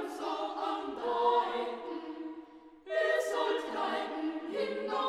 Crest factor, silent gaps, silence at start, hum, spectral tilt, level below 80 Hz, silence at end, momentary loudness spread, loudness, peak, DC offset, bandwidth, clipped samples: 18 dB; none; 0 s; none; -3 dB/octave; -76 dBFS; 0 s; 14 LU; -34 LUFS; -16 dBFS; under 0.1%; 14.5 kHz; under 0.1%